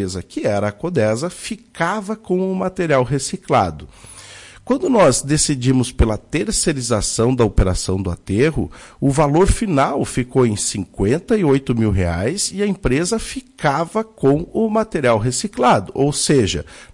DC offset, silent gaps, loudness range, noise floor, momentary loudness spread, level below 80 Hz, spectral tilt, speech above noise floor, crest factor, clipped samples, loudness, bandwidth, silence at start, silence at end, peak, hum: under 0.1%; none; 3 LU; -40 dBFS; 8 LU; -30 dBFS; -5 dB/octave; 22 dB; 14 dB; under 0.1%; -18 LUFS; 11.5 kHz; 0 s; 0.1 s; -4 dBFS; none